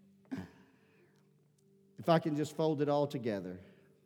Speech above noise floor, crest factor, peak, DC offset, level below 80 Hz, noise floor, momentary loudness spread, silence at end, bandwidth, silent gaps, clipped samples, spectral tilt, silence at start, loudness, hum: 36 dB; 22 dB; -14 dBFS; under 0.1%; -82 dBFS; -69 dBFS; 16 LU; 0.4 s; 17.5 kHz; none; under 0.1%; -7 dB/octave; 0.3 s; -35 LUFS; none